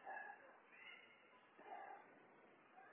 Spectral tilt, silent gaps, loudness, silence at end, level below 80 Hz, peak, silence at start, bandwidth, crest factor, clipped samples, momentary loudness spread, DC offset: 3.5 dB/octave; none; -60 LUFS; 0 s; under -90 dBFS; -42 dBFS; 0 s; 3.6 kHz; 18 dB; under 0.1%; 13 LU; under 0.1%